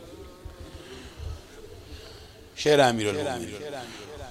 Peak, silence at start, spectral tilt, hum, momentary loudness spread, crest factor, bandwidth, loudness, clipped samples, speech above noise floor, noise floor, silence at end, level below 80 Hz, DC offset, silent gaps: -6 dBFS; 0 s; -4.5 dB/octave; none; 25 LU; 24 dB; 15.5 kHz; -25 LUFS; under 0.1%; 22 dB; -47 dBFS; 0 s; -48 dBFS; under 0.1%; none